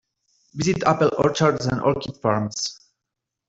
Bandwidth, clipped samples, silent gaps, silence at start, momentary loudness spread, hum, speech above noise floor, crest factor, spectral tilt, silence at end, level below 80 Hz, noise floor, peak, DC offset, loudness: 8 kHz; under 0.1%; none; 0.55 s; 8 LU; none; 62 dB; 20 dB; -5 dB/octave; 0.75 s; -52 dBFS; -84 dBFS; -4 dBFS; under 0.1%; -22 LUFS